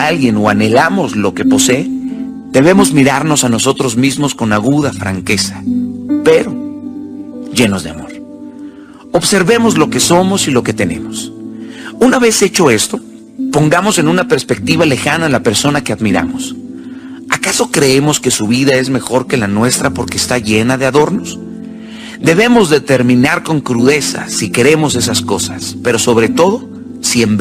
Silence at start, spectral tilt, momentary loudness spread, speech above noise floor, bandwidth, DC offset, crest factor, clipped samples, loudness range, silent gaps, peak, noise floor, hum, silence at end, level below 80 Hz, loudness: 0 s; -4 dB/octave; 17 LU; 21 dB; 16 kHz; under 0.1%; 12 dB; under 0.1%; 4 LU; none; 0 dBFS; -32 dBFS; none; 0 s; -44 dBFS; -11 LUFS